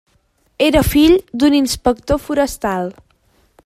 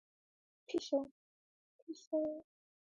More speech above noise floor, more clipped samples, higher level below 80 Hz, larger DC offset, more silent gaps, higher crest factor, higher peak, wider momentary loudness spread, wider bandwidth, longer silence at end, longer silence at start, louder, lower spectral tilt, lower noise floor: second, 45 dB vs over 51 dB; neither; first, -32 dBFS vs -84 dBFS; neither; second, none vs 1.11-1.87 s, 2.07-2.11 s; about the same, 16 dB vs 20 dB; first, 0 dBFS vs -24 dBFS; second, 9 LU vs 15 LU; first, 15.5 kHz vs 10.5 kHz; first, 0.75 s vs 0.55 s; about the same, 0.6 s vs 0.7 s; first, -15 LUFS vs -40 LUFS; about the same, -5 dB/octave vs -4 dB/octave; second, -60 dBFS vs under -90 dBFS